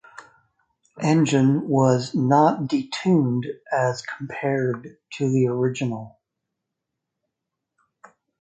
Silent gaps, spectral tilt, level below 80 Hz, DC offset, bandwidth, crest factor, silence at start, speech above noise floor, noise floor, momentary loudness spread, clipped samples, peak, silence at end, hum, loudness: none; -6.5 dB/octave; -66 dBFS; under 0.1%; 9.2 kHz; 18 dB; 0.2 s; 61 dB; -83 dBFS; 11 LU; under 0.1%; -4 dBFS; 2.3 s; none; -22 LUFS